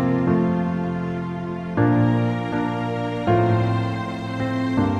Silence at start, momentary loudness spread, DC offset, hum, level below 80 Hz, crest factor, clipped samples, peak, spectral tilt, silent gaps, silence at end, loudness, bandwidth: 0 s; 9 LU; under 0.1%; none; -46 dBFS; 16 dB; under 0.1%; -6 dBFS; -8.5 dB/octave; none; 0 s; -22 LUFS; 8.2 kHz